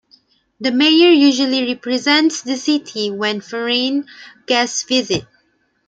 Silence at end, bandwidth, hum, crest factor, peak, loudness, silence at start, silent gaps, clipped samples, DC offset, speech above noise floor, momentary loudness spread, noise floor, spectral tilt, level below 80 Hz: 0.65 s; 9.2 kHz; none; 16 dB; 0 dBFS; -16 LUFS; 0.6 s; none; under 0.1%; under 0.1%; 46 dB; 12 LU; -62 dBFS; -2.5 dB/octave; -60 dBFS